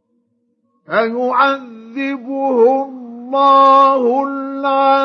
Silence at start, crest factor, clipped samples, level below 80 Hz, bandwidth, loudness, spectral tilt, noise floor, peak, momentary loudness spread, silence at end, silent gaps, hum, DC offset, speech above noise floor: 0.9 s; 14 dB; under 0.1%; -82 dBFS; 6.6 kHz; -14 LUFS; -5.5 dB/octave; -64 dBFS; 0 dBFS; 14 LU; 0 s; none; none; under 0.1%; 51 dB